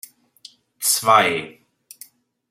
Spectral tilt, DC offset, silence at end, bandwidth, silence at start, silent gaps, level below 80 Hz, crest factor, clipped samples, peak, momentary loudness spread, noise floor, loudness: -1.5 dB/octave; under 0.1%; 1 s; 16.5 kHz; 0.8 s; none; -72 dBFS; 22 dB; under 0.1%; -2 dBFS; 14 LU; -49 dBFS; -17 LUFS